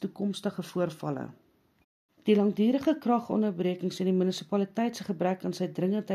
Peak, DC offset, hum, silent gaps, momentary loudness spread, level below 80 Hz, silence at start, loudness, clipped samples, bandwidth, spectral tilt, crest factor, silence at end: -12 dBFS; under 0.1%; none; 1.84-2.09 s; 9 LU; -76 dBFS; 0 s; -29 LUFS; under 0.1%; 14 kHz; -7 dB/octave; 18 dB; 0 s